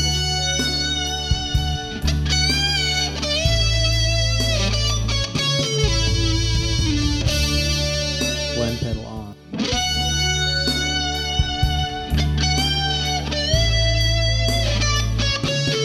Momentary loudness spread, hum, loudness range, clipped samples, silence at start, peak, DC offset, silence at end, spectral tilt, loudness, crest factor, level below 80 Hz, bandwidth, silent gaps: 5 LU; none; 2 LU; under 0.1%; 0 s; -4 dBFS; under 0.1%; 0 s; -3.5 dB/octave; -20 LUFS; 16 dB; -26 dBFS; 14.5 kHz; none